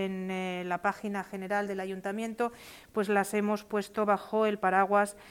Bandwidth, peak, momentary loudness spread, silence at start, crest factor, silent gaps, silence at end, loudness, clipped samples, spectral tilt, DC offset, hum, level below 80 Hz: 17 kHz; -12 dBFS; 9 LU; 0 s; 18 dB; none; 0 s; -31 LUFS; under 0.1%; -5.5 dB/octave; under 0.1%; none; -68 dBFS